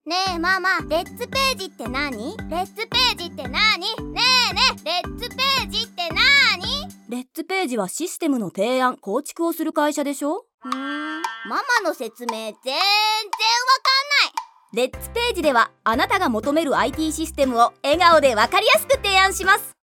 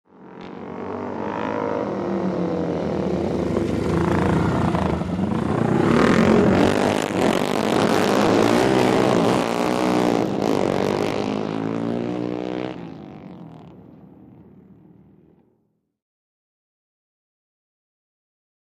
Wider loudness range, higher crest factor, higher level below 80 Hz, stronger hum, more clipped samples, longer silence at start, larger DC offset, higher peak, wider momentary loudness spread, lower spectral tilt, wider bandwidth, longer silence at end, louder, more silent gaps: second, 6 LU vs 11 LU; about the same, 18 dB vs 20 dB; about the same, -44 dBFS vs -44 dBFS; neither; neither; second, 0.05 s vs 0.2 s; neither; about the same, -2 dBFS vs -2 dBFS; about the same, 13 LU vs 14 LU; second, -2.5 dB/octave vs -6.5 dB/octave; first, 19 kHz vs 15.5 kHz; second, 0.15 s vs 4.7 s; about the same, -20 LUFS vs -21 LUFS; first, 10.54-10.58 s vs none